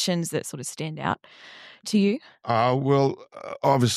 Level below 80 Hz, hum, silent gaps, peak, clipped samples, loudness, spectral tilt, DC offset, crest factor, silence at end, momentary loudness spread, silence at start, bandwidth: -66 dBFS; none; none; -6 dBFS; under 0.1%; -25 LUFS; -5.5 dB/octave; under 0.1%; 18 dB; 0 s; 17 LU; 0 s; 14.5 kHz